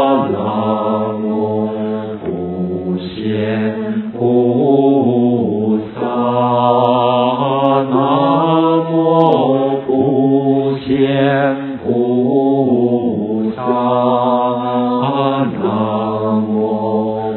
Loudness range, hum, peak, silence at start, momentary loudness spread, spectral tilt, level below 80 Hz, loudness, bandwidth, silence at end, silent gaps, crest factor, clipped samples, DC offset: 5 LU; none; 0 dBFS; 0 s; 7 LU; -11 dB/octave; -52 dBFS; -15 LUFS; 4.3 kHz; 0 s; none; 14 dB; under 0.1%; under 0.1%